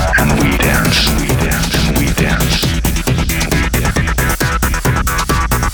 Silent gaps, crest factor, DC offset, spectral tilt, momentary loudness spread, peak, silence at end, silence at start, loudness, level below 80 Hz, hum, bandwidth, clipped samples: none; 12 dB; under 0.1%; -4 dB/octave; 4 LU; 0 dBFS; 0 s; 0 s; -14 LUFS; -18 dBFS; none; over 20 kHz; under 0.1%